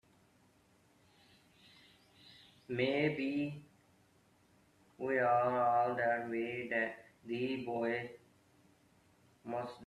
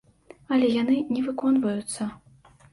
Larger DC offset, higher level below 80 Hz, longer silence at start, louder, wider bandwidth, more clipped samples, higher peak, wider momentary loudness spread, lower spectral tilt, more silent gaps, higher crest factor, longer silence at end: neither; second, -78 dBFS vs -64 dBFS; first, 2.3 s vs 0.5 s; second, -36 LUFS vs -25 LUFS; first, 13 kHz vs 11.5 kHz; neither; second, -20 dBFS vs -12 dBFS; first, 21 LU vs 10 LU; first, -7 dB/octave vs -5 dB/octave; neither; about the same, 18 dB vs 14 dB; second, 0 s vs 0.55 s